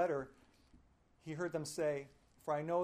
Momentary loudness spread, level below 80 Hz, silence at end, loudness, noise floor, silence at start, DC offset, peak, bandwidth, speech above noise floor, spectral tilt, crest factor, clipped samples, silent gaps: 16 LU; -72 dBFS; 0 s; -41 LUFS; -68 dBFS; 0 s; under 0.1%; -24 dBFS; 15.5 kHz; 29 dB; -5.5 dB/octave; 16 dB; under 0.1%; none